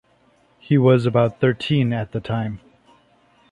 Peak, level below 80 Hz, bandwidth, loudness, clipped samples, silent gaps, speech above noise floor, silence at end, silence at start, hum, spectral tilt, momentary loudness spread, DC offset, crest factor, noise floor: -4 dBFS; -54 dBFS; 9.2 kHz; -20 LUFS; under 0.1%; none; 40 dB; 0.95 s; 0.7 s; none; -8.5 dB/octave; 10 LU; under 0.1%; 18 dB; -58 dBFS